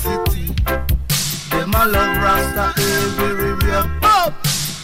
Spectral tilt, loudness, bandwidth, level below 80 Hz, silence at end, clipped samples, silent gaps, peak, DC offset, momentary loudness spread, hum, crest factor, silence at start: -4 dB/octave; -17 LUFS; 16.5 kHz; -26 dBFS; 0 s; under 0.1%; none; -4 dBFS; under 0.1%; 6 LU; none; 12 dB; 0 s